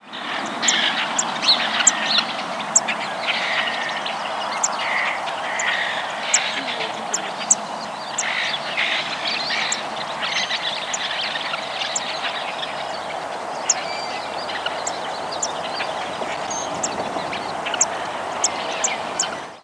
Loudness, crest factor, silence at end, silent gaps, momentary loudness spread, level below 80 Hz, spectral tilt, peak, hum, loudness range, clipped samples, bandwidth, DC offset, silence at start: -22 LUFS; 22 dB; 0 s; none; 8 LU; -66 dBFS; 0 dB/octave; 0 dBFS; none; 6 LU; under 0.1%; 11 kHz; under 0.1%; 0 s